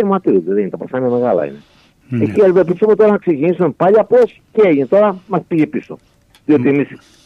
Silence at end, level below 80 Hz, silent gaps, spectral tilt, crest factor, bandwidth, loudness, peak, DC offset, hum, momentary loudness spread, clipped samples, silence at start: 0.3 s; -56 dBFS; none; -9.5 dB/octave; 12 dB; 6.4 kHz; -14 LUFS; -2 dBFS; under 0.1%; none; 9 LU; under 0.1%; 0 s